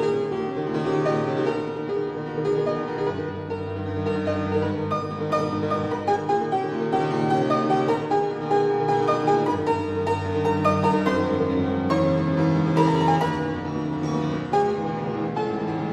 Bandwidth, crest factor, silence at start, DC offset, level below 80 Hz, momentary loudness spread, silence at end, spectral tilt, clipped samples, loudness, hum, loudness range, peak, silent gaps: 10.5 kHz; 16 dB; 0 s; under 0.1%; -54 dBFS; 7 LU; 0 s; -7.5 dB/octave; under 0.1%; -24 LUFS; none; 4 LU; -6 dBFS; none